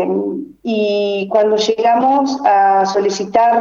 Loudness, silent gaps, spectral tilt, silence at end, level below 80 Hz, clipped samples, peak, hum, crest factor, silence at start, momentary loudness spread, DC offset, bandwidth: -14 LUFS; none; -4.5 dB/octave; 0 s; -60 dBFS; under 0.1%; 0 dBFS; none; 14 dB; 0 s; 7 LU; under 0.1%; 7.6 kHz